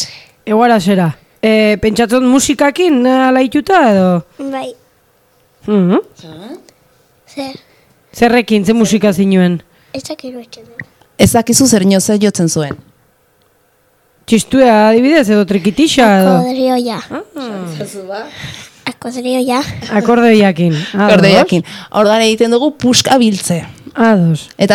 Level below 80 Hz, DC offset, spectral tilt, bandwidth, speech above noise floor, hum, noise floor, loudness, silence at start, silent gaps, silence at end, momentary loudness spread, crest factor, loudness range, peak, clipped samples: -44 dBFS; under 0.1%; -5 dB/octave; 17.5 kHz; 43 dB; none; -54 dBFS; -11 LUFS; 0 s; none; 0 s; 18 LU; 12 dB; 8 LU; 0 dBFS; 0.3%